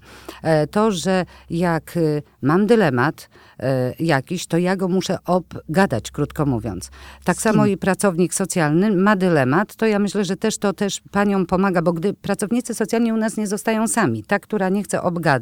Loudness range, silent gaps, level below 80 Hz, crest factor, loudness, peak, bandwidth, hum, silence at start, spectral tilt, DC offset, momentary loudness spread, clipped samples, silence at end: 3 LU; none; -48 dBFS; 18 dB; -20 LUFS; -2 dBFS; 17 kHz; none; 0.1 s; -5.5 dB/octave; under 0.1%; 7 LU; under 0.1%; 0 s